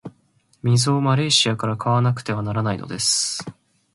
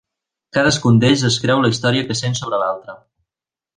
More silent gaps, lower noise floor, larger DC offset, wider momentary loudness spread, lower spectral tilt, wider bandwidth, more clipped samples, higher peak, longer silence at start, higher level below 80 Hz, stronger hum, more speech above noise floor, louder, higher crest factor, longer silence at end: neither; second, -61 dBFS vs -90 dBFS; neither; about the same, 9 LU vs 9 LU; about the same, -4 dB/octave vs -5 dB/octave; first, 11.5 kHz vs 10 kHz; neither; about the same, -4 dBFS vs -2 dBFS; second, 0.05 s vs 0.55 s; second, -56 dBFS vs -50 dBFS; neither; second, 41 dB vs 74 dB; second, -20 LUFS vs -16 LUFS; about the same, 18 dB vs 16 dB; second, 0.45 s vs 0.8 s